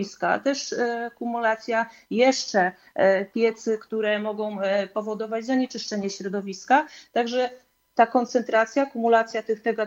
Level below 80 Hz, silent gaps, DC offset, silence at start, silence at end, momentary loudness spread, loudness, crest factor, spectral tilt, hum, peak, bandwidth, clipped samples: -74 dBFS; none; under 0.1%; 0 s; 0 s; 8 LU; -24 LUFS; 18 dB; -4 dB/octave; none; -6 dBFS; 16 kHz; under 0.1%